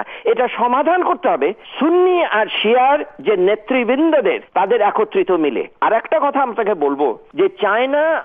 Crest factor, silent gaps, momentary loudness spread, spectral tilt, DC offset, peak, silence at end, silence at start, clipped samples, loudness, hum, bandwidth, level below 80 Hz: 12 dB; none; 5 LU; -8 dB/octave; under 0.1%; -4 dBFS; 0 s; 0 s; under 0.1%; -16 LUFS; none; 3.8 kHz; -64 dBFS